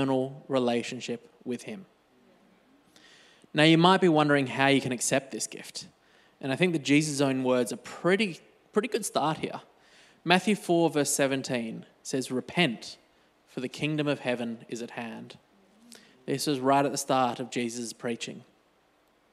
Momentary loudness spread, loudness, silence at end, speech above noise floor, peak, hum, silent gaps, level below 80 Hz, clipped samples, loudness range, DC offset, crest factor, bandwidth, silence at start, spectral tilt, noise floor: 16 LU; -27 LUFS; 0.9 s; 39 dB; -4 dBFS; none; none; -76 dBFS; under 0.1%; 8 LU; under 0.1%; 24 dB; 15 kHz; 0 s; -4.5 dB/octave; -66 dBFS